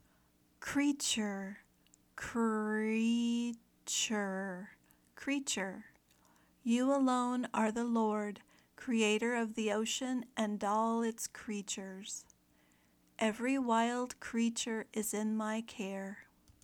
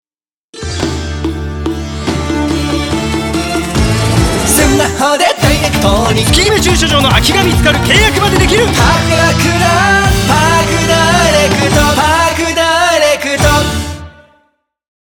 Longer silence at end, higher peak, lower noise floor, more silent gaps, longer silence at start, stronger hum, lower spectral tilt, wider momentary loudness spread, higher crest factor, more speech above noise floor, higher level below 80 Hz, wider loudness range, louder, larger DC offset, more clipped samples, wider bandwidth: second, 0.4 s vs 0.95 s; second, -20 dBFS vs 0 dBFS; second, -70 dBFS vs under -90 dBFS; neither; about the same, 0.6 s vs 0.55 s; neither; about the same, -3.5 dB/octave vs -4 dB/octave; first, 13 LU vs 10 LU; first, 18 dB vs 10 dB; second, 36 dB vs over 81 dB; second, -74 dBFS vs -22 dBFS; about the same, 4 LU vs 6 LU; second, -35 LUFS vs -10 LUFS; neither; neither; second, 17.5 kHz vs over 20 kHz